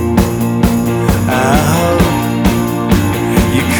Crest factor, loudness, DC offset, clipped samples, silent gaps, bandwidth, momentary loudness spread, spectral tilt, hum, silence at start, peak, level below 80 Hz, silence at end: 12 dB; -12 LUFS; under 0.1%; under 0.1%; none; over 20 kHz; 2 LU; -6 dB/octave; none; 0 s; 0 dBFS; -24 dBFS; 0 s